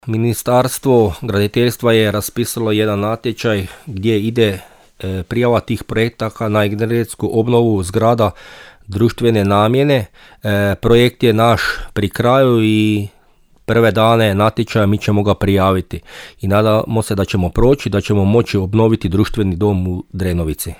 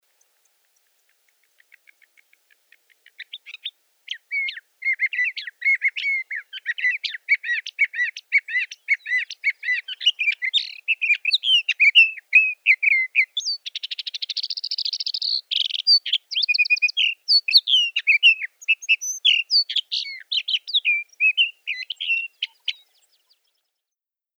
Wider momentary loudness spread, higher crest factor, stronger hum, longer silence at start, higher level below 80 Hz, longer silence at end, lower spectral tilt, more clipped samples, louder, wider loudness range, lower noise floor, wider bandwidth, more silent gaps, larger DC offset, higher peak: second, 9 LU vs 14 LU; second, 14 dB vs 20 dB; neither; second, 0.05 s vs 3.2 s; first, -34 dBFS vs under -90 dBFS; second, 0.05 s vs 1.65 s; first, -6.5 dB/octave vs 11 dB/octave; neither; first, -15 LUFS vs -19 LUFS; second, 4 LU vs 8 LU; second, -50 dBFS vs -89 dBFS; second, 18 kHz vs over 20 kHz; neither; neither; about the same, -2 dBFS vs -4 dBFS